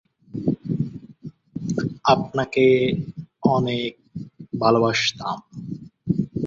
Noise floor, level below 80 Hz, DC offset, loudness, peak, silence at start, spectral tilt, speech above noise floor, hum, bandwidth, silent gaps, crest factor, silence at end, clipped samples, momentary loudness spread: -42 dBFS; -54 dBFS; under 0.1%; -22 LUFS; -2 dBFS; 0.35 s; -6 dB/octave; 22 dB; none; 7.8 kHz; none; 20 dB; 0 s; under 0.1%; 19 LU